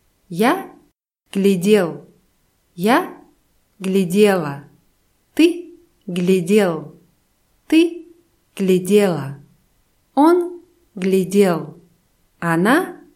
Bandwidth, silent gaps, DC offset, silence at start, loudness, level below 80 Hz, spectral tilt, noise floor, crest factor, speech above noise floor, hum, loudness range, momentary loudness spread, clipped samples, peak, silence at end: 16 kHz; none; under 0.1%; 0.3 s; -18 LUFS; -64 dBFS; -6 dB/octave; -62 dBFS; 18 dB; 46 dB; none; 2 LU; 17 LU; under 0.1%; -2 dBFS; 0.2 s